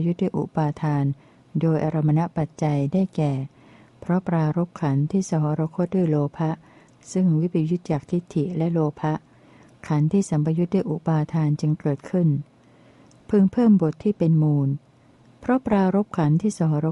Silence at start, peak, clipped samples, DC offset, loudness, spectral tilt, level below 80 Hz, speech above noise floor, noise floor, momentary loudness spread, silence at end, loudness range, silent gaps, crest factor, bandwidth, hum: 0 s; -8 dBFS; under 0.1%; under 0.1%; -23 LUFS; -8.5 dB/octave; -58 dBFS; 32 dB; -54 dBFS; 8 LU; 0 s; 3 LU; none; 14 dB; 10.5 kHz; none